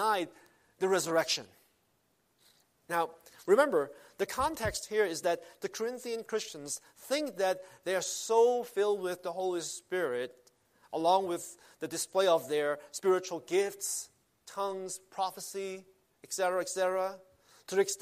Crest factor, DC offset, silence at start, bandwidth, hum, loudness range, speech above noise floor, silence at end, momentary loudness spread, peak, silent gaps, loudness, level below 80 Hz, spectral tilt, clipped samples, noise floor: 22 dB; under 0.1%; 0 s; 15.5 kHz; none; 4 LU; 42 dB; 0.05 s; 12 LU; -12 dBFS; none; -32 LUFS; -66 dBFS; -3 dB/octave; under 0.1%; -74 dBFS